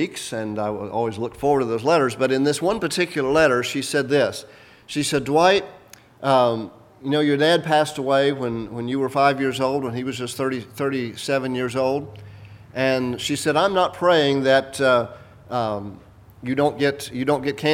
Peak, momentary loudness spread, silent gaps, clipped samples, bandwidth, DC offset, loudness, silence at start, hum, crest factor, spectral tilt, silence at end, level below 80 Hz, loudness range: -2 dBFS; 11 LU; none; under 0.1%; 17 kHz; under 0.1%; -21 LUFS; 0 s; none; 18 dB; -4.5 dB/octave; 0 s; -56 dBFS; 3 LU